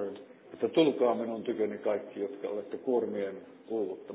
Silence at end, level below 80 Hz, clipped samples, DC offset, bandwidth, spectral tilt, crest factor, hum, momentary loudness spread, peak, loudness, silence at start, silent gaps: 0 s; -82 dBFS; under 0.1%; under 0.1%; 4 kHz; -4.5 dB/octave; 20 dB; none; 13 LU; -12 dBFS; -32 LUFS; 0 s; none